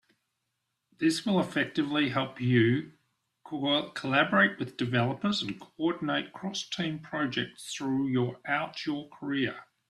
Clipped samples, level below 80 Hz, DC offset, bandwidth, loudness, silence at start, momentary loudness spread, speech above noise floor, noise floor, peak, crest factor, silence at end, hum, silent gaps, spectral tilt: under 0.1%; -70 dBFS; under 0.1%; 12.5 kHz; -29 LUFS; 1 s; 10 LU; 52 dB; -82 dBFS; -10 dBFS; 20 dB; 0.25 s; none; none; -5.5 dB/octave